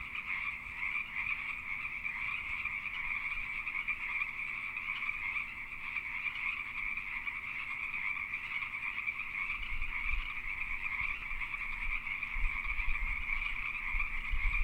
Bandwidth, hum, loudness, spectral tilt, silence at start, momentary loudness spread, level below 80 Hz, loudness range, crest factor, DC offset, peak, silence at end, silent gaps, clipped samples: 16 kHz; none; -36 LUFS; -3.5 dB/octave; 0 s; 3 LU; -44 dBFS; 1 LU; 18 dB; under 0.1%; -20 dBFS; 0 s; none; under 0.1%